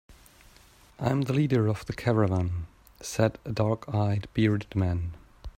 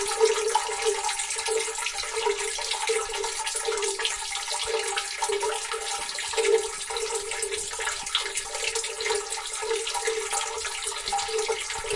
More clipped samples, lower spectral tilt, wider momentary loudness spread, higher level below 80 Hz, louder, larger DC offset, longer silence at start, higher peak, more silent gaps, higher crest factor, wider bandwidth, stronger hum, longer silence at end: neither; first, -7 dB/octave vs 1 dB/octave; first, 11 LU vs 4 LU; about the same, -50 dBFS vs -54 dBFS; about the same, -28 LUFS vs -27 LUFS; neither; about the same, 0.1 s vs 0 s; about the same, -8 dBFS vs -8 dBFS; neither; about the same, 20 dB vs 20 dB; first, 15.5 kHz vs 11.5 kHz; neither; about the same, 0.05 s vs 0 s